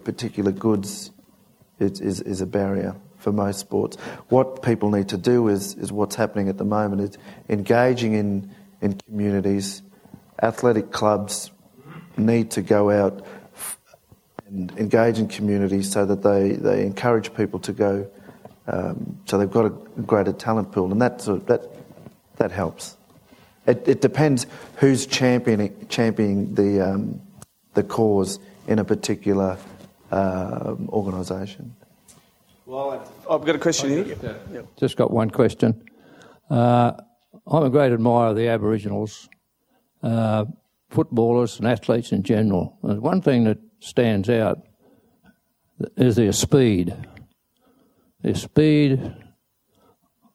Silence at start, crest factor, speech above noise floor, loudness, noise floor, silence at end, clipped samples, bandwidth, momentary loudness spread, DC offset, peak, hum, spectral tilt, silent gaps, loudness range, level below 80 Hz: 0.05 s; 20 dB; 46 dB; -22 LUFS; -67 dBFS; 1.2 s; under 0.1%; 15.5 kHz; 14 LU; under 0.1%; -2 dBFS; none; -6 dB/octave; none; 5 LU; -56 dBFS